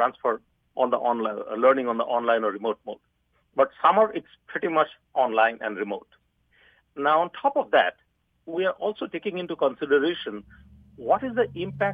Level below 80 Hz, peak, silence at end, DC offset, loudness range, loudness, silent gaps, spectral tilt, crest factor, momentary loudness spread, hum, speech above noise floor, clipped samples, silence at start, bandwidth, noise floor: -66 dBFS; -6 dBFS; 0 s; under 0.1%; 3 LU; -25 LUFS; none; -7.5 dB/octave; 20 dB; 14 LU; none; 38 dB; under 0.1%; 0 s; 4.9 kHz; -63 dBFS